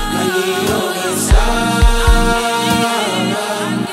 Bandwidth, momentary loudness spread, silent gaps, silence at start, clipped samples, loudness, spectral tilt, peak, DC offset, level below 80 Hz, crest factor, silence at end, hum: 16.5 kHz; 4 LU; none; 0 s; under 0.1%; -15 LUFS; -4 dB/octave; 0 dBFS; under 0.1%; -18 dBFS; 14 dB; 0 s; none